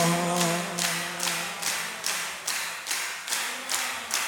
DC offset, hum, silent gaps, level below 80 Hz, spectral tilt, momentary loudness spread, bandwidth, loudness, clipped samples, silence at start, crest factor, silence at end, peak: under 0.1%; none; none; -74 dBFS; -2 dB/octave; 4 LU; 19.5 kHz; -27 LUFS; under 0.1%; 0 s; 20 dB; 0 s; -8 dBFS